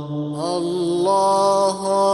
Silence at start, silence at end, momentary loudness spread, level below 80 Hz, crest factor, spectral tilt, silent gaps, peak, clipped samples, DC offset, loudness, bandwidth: 0 s; 0 s; 8 LU; -60 dBFS; 14 dB; -5.5 dB/octave; none; -6 dBFS; under 0.1%; under 0.1%; -19 LUFS; 11.5 kHz